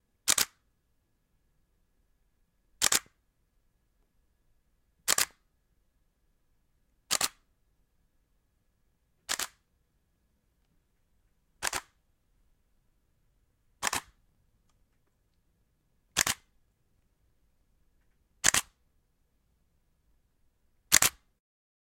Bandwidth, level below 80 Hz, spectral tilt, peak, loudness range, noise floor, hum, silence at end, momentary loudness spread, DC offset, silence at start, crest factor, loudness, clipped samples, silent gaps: 16.5 kHz; -64 dBFS; 1 dB/octave; 0 dBFS; 11 LU; -74 dBFS; none; 0.75 s; 12 LU; under 0.1%; 0.25 s; 36 dB; -29 LUFS; under 0.1%; none